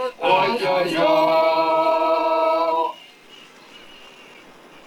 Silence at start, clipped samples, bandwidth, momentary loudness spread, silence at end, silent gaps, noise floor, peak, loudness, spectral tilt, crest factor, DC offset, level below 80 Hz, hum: 0 s; under 0.1%; 15.5 kHz; 4 LU; 0.8 s; none; -46 dBFS; -6 dBFS; -19 LUFS; -4.5 dB/octave; 16 dB; under 0.1%; -68 dBFS; none